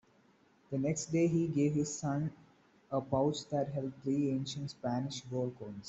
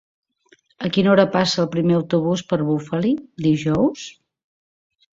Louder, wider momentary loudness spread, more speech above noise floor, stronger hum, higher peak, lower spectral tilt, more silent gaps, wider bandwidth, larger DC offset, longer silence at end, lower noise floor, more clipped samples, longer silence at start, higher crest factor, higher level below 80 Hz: second, -35 LUFS vs -19 LUFS; about the same, 8 LU vs 7 LU; second, 33 dB vs 39 dB; neither; second, -18 dBFS vs -2 dBFS; about the same, -6 dB/octave vs -6.5 dB/octave; neither; about the same, 8.2 kHz vs 7.8 kHz; neither; second, 0 s vs 1 s; first, -67 dBFS vs -58 dBFS; neither; about the same, 0.7 s vs 0.8 s; about the same, 18 dB vs 18 dB; second, -68 dBFS vs -54 dBFS